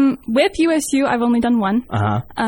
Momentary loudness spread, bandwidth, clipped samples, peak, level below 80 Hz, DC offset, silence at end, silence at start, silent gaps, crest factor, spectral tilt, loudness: 4 LU; 19 kHz; under 0.1%; -4 dBFS; -46 dBFS; under 0.1%; 0 s; 0 s; none; 14 dB; -5.5 dB/octave; -17 LUFS